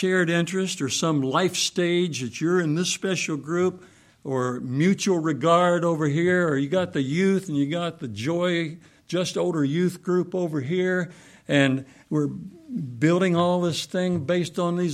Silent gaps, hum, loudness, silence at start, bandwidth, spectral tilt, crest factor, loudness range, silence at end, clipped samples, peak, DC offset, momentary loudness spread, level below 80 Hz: none; none; -24 LUFS; 0 s; 14.5 kHz; -5 dB/octave; 18 dB; 3 LU; 0 s; under 0.1%; -6 dBFS; under 0.1%; 8 LU; -66 dBFS